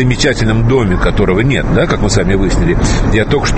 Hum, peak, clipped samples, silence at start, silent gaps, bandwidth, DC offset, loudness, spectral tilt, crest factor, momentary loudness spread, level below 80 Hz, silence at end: none; 0 dBFS; under 0.1%; 0 s; none; 8.8 kHz; under 0.1%; -12 LUFS; -5.5 dB/octave; 10 dB; 1 LU; -18 dBFS; 0 s